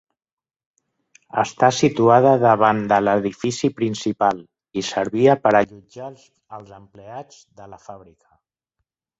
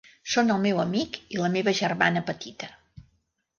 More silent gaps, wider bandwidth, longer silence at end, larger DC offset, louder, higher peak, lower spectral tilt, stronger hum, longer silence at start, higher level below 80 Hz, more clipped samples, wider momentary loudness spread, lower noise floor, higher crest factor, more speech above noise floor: neither; first, 8.2 kHz vs 7.4 kHz; first, 1.25 s vs 0.9 s; neither; first, -18 LUFS vs -25 LUFS; first, -2 dBFS vs -6 dBFS; about the same, -5.5 dB/octave vs -5 dB/octave; neither; first, 1.35 s vs 0.25 s; first, -58 dBFS vs -64 dBFS; neither; first, 23 LU vs 13 LU; first, -79 dBFS vs -72 dBFS; about the same, 20 dB vs 20 dB; first, 60 dB vs 46 dB